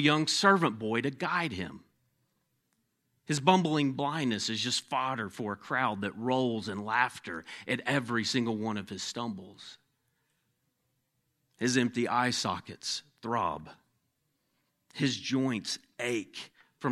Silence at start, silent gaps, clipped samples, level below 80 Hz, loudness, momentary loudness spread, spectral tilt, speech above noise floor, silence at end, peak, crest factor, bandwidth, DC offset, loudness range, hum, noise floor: 0 s; none; under 0.1%; -72 dBFS; -31 LUFS; 15 LU; -4 dB/octave; 48 dB; 0 s; -6 dBFS; 26 dB; 13.5 kHz; under 0.1%; 5 LU; none; -78 dBFS